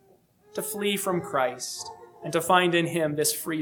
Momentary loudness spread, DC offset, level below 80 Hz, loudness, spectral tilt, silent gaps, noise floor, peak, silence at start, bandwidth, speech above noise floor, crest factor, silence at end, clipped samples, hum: 15 LU; under 0.1%; -70 dBFS; -26 LUFS; -3.5 dB/octave; none; -60 dBFS; -6 dBFS; 0.55 s; 19 kHz; 34 dB; 20 dB; 0 s; under 0.1%; none